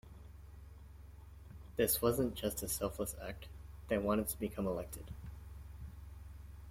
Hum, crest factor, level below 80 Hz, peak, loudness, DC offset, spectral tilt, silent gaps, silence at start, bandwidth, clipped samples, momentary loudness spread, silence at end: none; 22 dB; -52 dBFS; -18 dBFS; -37 LUFS; under 0.1%; -4.5 dB/octave; none; 0.05 s; 16.5 kHz; under 0.1%; 22 LU; 0 s